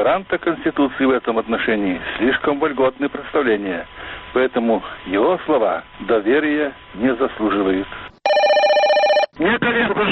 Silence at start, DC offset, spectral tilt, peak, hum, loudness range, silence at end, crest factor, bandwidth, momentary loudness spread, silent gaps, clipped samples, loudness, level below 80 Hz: 0 s; under 0.1%; -6 dB/octave; -6 dBFS; none; 3 LU; 0 s; 12 dB; 8.2 kHz; 9 LU; none; under 0.1%; -18 LUFS; -48 dBFS